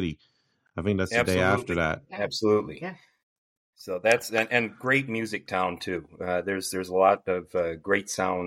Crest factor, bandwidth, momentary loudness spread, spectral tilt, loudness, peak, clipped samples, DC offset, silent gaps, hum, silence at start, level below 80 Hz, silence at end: 22 dB; 16 kHz; 11 LU; -4.5 dB/octave; -26 LUFS; -6 dBFS; under 0.1%; under 0.1%; 3.23-3.73 s; none; 0 s; -56 dBFS; 0 s